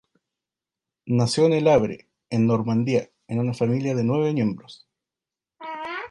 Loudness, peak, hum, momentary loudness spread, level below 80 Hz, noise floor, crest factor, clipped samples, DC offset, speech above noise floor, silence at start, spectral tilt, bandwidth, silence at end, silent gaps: -23 LUFS; -6 dBFS; none; 15 LU; -58 dBFS; -89 dBFS; 18 dB; under 0.1%; under 0.1%; 68 dB; 1.05 s; -7 dB/octave; 11.5 kHz; 0.05 s; none